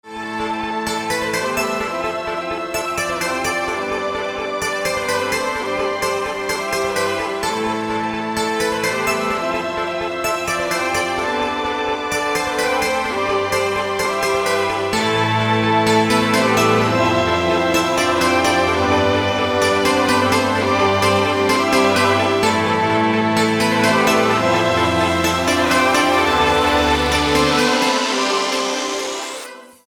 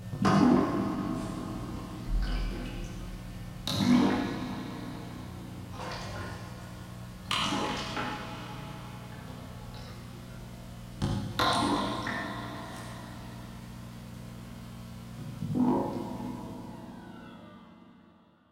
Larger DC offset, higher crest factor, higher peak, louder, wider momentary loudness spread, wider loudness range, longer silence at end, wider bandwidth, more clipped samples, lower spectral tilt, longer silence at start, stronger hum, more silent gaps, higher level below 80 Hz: neither; second, 16 dB vs 22 dB; first, -2 dBFS vs -10 dBFS; first, -17 LUFS vs -32 LUFS; second, 7 LU vs 18 LU; second, 5 LU vs 8 LU; second, 0.2 s vs 0.5 s; first, 20 kHz vs 16 kHz; neither; second, -4 dB/octave vs -5.5 dB/octave; about the same, 0.05 s vs 0 s; second, none vs 60 Hz at -45 dBFS; neither; about the same, -42 dBFS vs -44 dBFS